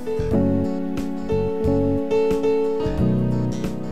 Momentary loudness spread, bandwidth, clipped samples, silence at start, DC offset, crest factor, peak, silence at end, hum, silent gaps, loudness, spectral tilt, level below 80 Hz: 6 LU; 13.5 kHz; under 0.1%; 0 s; 3%; 14 dB; -8 dBFS; 0 s; none; none; -22 LUFS; -8.5 dB/octave; -36 dBFS